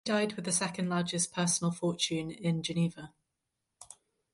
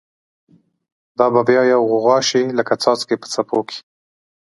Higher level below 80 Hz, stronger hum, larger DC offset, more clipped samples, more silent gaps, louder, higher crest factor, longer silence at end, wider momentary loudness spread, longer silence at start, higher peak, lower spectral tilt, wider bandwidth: about the same, -70 dBFS vs -68 dBFS; neither; neither; neither; neither; second, -31 LUFS vs -16 LUFS; about the same, 18 dB vs 18 dB; second, 0.4 s vs 0.8 s; first, 22 LU vs 9 LU; second, 0.05 s vs 1.2 s; second, -14 dBFS vs 0 dBFS; about the same, -4 dB/octave vs -4 dB/octave; about the same, 11.5 kHz vs 11.5 kHz